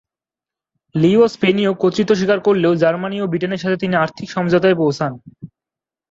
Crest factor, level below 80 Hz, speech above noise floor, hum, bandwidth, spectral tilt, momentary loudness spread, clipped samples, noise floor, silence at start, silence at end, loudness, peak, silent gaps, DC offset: 16 dB; -56 dBFS; 73 dB; none; 7.8 kHz; -7 dB/octave; 8 LU; under 0.1%; -89 dBFS; 0.95 s; 0.65 s; -17 LUFS; -2 dBFS; none; under 0.1%